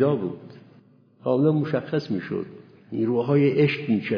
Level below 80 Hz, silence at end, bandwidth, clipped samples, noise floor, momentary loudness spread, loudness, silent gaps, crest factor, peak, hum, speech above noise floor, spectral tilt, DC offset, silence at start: -70 dBFS; 0 s; 5.4 kHz; under 0.1%; -55 dBFS; 13 LU; -24 LUFS; none; 16 dB; -8 dBFS; none; 32 dB; -9.5 dB/octave; under 0.1%; 0 s